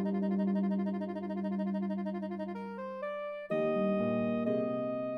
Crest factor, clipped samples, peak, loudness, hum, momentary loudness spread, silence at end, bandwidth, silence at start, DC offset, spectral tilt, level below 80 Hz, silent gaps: 14 dB; under 0.1%; -20 dBFS; -34 LUFS; none; 9 LU; 0 s; 5.2 kHz; 0 s; under 0.1%; -10 dB/octave; -80 dBFS; none